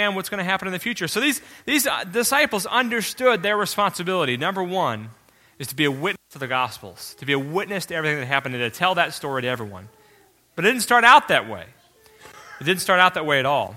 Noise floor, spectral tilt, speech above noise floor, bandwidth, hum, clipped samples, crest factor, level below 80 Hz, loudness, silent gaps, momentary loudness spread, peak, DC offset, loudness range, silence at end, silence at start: -56 dBFS; -3 dB/octave; 35 dB; 16.5 kHz; none; under 0.1%; 22 dB; -62 dBFS; -21 LUFS; none; 14 LU; 0 dBFS; under 0.1%; 6 LU; 0 s; 0 s